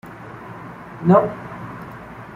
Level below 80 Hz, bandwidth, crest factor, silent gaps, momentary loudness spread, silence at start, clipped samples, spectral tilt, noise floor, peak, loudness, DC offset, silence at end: -54 dBFS; 4.5 kHz; 20 dB; none; 21 LU; 0.05 s; under 0.1%; -9.5 dB/octave; -37 dBFS; -2 dBFS; -18 LUFS; under 0.1%; 0 s